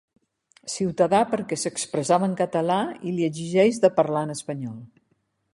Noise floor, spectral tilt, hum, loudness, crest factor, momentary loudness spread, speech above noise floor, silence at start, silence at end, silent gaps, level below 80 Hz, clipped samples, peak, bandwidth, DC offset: -70 dBFS; -5 dB/octave; none; -24 LUFS; 20 dB; 13 LU; 47 dB; 0.65 s; 0.7 s; none; -66 dBFS; under 0.1%; -4 dBFS; 11.5 kHz; under 0.1%